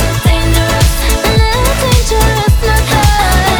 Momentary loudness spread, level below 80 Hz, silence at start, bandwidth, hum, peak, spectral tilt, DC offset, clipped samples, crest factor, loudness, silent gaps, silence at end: 2 LU; -14 dBFS; 0 s; over 20 kHz; none; 0 dBFS; -4.5 dB/octave; under 0.1%; 0.1%; 10 dB; -11 LUFS; none; 0 s